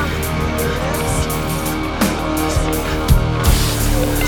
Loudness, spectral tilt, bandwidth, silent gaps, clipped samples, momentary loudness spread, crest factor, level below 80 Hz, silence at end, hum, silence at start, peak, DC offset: -18 LUFS; -5 dB/octave; over 20 kHz; none; under 0.1%; 4 LU; 16 dB; -22 dBFS; 0 s; none; 0 s; 0 dBFS; under 0.1%